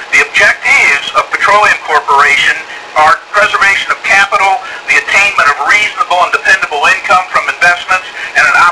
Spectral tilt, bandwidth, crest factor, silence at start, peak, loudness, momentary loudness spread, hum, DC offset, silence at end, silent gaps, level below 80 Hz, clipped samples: -0.5 dB/octave; 11 kHz; 10 dB; 0 s; 0 dBFS; -8 LUFS; 6 LU; none; under 0.1%; 0 s; none; -46 dBFS; 1%